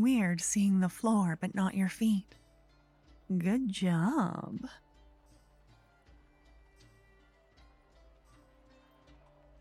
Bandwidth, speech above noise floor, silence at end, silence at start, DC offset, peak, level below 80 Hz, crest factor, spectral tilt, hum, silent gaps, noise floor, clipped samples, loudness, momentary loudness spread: 15 kHz; 34 dB; 4.85 s; 0 s; under 0.1%; -18 dBFS; -64 dBFS; 16 dB; -5.5 dB/octave; none; none; -64 dBFS; under 0.1%; -31 LUFS; 9 LU